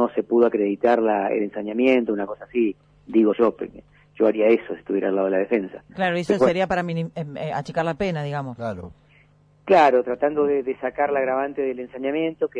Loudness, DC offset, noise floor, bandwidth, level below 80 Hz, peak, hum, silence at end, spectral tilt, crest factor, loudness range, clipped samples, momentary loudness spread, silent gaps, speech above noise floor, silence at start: -22 LUFS; under 0.1%; -56 dBFS; 10 kHz; -58 dBFS; -6 dBFS; 50 Hz at -55 dBFS; 0 s; -7.5 dB/octave; 16 dB; 3 LU; under 0.1%; 10 LU; none; 34 dB; 0 s